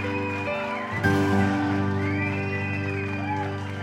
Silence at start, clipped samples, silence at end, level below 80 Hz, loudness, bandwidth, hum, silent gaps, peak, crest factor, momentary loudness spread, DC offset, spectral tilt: 0 s; under 0.1%; 0 s; -56 dBFS; -26 LUFS; 13 kHz; 50 Hz at -50 dBFS; none; -8 dBFS; 18 dB; 6 LU; under 0.1%; -7 dB/octave